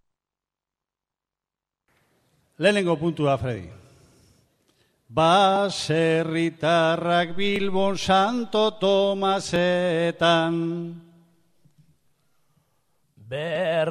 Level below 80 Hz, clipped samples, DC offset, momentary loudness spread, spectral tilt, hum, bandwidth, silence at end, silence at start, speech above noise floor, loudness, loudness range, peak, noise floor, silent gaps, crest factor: -58 dBFS; under 0.1%; under 0.1%; 9 LU; -5 dB/octave; none; 13 kHz; 0 s; 2.6 s; 67 dB; -22 LUFS; 6 LU; -6 dBFS; -89 dBFS; none; 18 dB